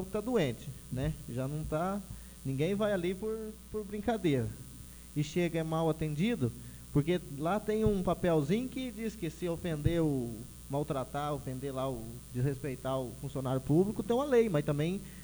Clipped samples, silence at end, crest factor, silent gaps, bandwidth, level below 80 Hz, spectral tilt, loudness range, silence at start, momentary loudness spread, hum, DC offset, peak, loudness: under 0.1%; 0 s; 20 dB; none; over 20 kHz; -50 dBFS; -7 dB/octave; 3 LU; 0 s; 11 LU; none; under 0.1%; -14 dBFS; -34 LUFS